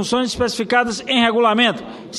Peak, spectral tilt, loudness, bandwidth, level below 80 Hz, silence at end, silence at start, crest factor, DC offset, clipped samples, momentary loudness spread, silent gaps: -2 dBFS; -3.5 dB/octave; -17 LUFS; 12.5 kHz; -48 dBFS; 0 s; 0 s; 16 dB; under 0.1%; under 0.1%; 6 LU; none